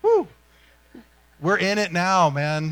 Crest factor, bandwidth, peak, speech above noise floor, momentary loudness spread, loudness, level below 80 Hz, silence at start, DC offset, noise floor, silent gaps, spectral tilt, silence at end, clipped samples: 16 dB; 17 kHz; -8 dBFS; 35 dB; 8 LU; -21 LUFS; -58 dBFS; 0.05 s; under 0.1%; -55 dBFS; none; -5 dB/octave; 0 s; under 0.1%